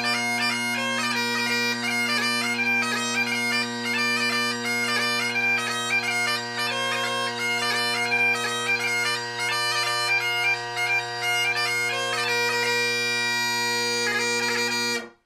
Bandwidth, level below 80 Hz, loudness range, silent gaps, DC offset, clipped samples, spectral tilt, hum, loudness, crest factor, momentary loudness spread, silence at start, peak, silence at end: 15.5 kHz; -76 dBFS; 1 LU; none; under 0.1%; under 0.1%; -1.5 dB/octave; none; -23 LUFS; 12 dB; 3 LU; 0 s; -12 dBFS; 0.15 s